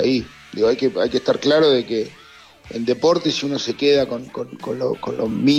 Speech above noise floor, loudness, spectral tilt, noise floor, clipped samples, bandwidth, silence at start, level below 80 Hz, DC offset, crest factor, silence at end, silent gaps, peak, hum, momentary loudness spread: 26 dB; -20 LUFS; -5 dB/octave; -45 dBFS; under 0.1%; 10.5 kHz; 0 s; -54 dBFS; under 0.1%; 14 dB; 0 s; none; -6 dBFS; none; 13 LU